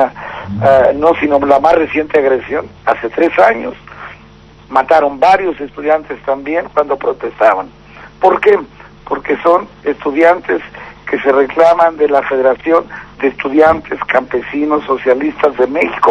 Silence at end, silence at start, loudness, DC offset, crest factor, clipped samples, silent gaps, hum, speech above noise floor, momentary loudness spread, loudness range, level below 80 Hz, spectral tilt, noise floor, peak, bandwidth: 0 s; 0 s; -12 LUFS; under 0.1%; 12 dB; 0.6%; none; none; 27 dB; 11 LU; 3 LU; -44 dBFS; -6.5 dB/octave; -39 dBFS; 0 dBFS; 9.2 kHz